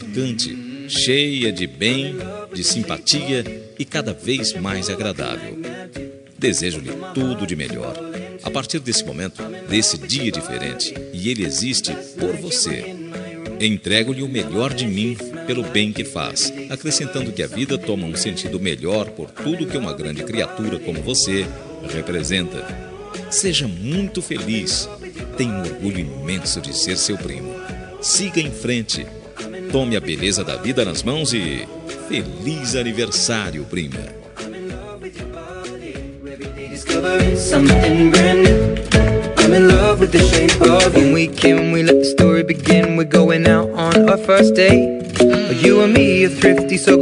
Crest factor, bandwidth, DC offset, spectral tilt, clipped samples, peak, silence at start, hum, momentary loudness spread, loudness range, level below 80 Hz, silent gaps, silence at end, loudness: 18 dB; 11.5 kHz; under 0.1%; -4.5 dB/octave; under 0.1%; 0 dBFS; 0 s; none; 19 LU; 11 LU; -34 dBFS; none; 0 s; -17 LUFS